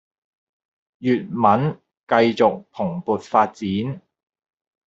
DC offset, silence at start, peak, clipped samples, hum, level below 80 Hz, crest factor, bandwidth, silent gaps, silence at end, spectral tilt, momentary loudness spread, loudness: under 0.1%; 1 s; -2 dBFS; under 0.1%; none; -64 dBFS; 20 dB; 7.8 kHz; 1.99-2.07 s; 0.9 s; -7.5 dB/octave; 10 LU; -21 LUFS